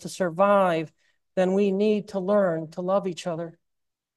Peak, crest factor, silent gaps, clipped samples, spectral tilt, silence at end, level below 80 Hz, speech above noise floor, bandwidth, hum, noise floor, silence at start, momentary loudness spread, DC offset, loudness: -8 dBFS; 16 dB; none; under 0.1%; -6.5 dB/octave; 0.65 s; -74 dBFS; 59 dB; 12.5 kHz; none; -83 dBFS; 0 s; 12 LU; under 0.1%; -24 LUFS